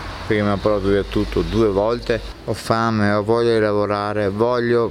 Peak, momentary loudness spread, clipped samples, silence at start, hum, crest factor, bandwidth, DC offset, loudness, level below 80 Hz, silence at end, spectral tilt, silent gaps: -2 dBFS; 5 LU; under 0.1%; 0 s; none; 18 dB; 14.5 kHz; under 0.1%; -19 LUFS; -36 dBFS; 0 s; -7 dB/octave; none